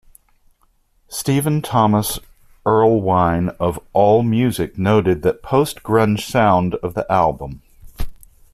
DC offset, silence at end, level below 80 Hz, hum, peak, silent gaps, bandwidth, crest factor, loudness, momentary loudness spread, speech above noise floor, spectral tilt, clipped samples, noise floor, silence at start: under 0.1%; 0.4 s; -38 dBFS; none; -2 dBFS; none; 15.5 kHz; 16 dB; -17 LUFS; 15 LU; 43 dB; -6.5 dB/octave; under 0.1%; -59 dBFS; 1.1 s